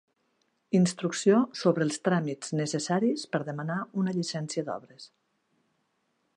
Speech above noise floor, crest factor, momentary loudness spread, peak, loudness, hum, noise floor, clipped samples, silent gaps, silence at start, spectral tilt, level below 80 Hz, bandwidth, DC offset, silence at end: 47 dB; 20 dB; 9 LU; -10 dBFS; -28 LUFS; none; -75 dBFS; under 0.1%; none; 0.7 s; -5.5 dB/octave; -76 dBFS; 11 kHz; under 0.1%; 1.3 s